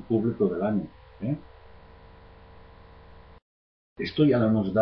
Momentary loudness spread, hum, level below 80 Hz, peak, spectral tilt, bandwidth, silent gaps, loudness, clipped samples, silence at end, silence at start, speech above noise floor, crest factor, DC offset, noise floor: 14 LU; none; -54 dBFS; -10 dBFS; -10 dB/octave; 5.6 kHz; 3.42-3.96 s; -26 LUFS; under 0.1%; 0 s; 0 s; 25 dB; 18 dB; under 0.1%; -50 dBFS